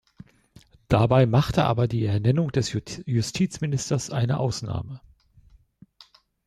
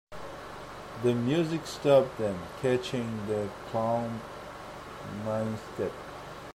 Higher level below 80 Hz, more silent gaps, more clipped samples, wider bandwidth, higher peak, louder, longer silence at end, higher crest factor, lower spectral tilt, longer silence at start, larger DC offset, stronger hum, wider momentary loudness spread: first, -48 dBFS vs -58 dBFS; neither; neither; second, 13 kHz vs 15.5 kHz; first, -6 dBFS vs -10 dBFS; first, -24 LUFS vs -30 LUFS; first, 1.5 s vs 0.05 s; about the same, 18 dB vs 20 dB; about the same, -6.5 dB/octave vs -6.5 dB/octave; first, 0.9 s vs 0.1 s; neither; neither; second, 12 LU vs 18 LU